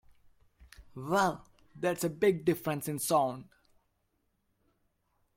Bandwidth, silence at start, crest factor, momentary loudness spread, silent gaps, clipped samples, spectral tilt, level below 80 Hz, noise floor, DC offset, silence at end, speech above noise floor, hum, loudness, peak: 16.5 kHz; 0.6 s; 20 dB; 17 LU; none; under 0.1%; -5 dB/octave; -66 dBFS; -77 dBFS; under 0.1%; 1.95 s; 47 dB; none; -31 LUFS; -14 dBFS